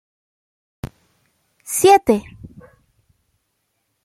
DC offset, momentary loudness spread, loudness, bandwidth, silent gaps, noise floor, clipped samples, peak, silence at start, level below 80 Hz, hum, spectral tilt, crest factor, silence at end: under 0.1%; 27 LU; -15 LUFS; 16 kHz; none; -71 dBFS; under 0.1%; 0 dBFS; 0.85 s; -50 dBFS; none; -4 dB/octave; 22 dB; 1.85 s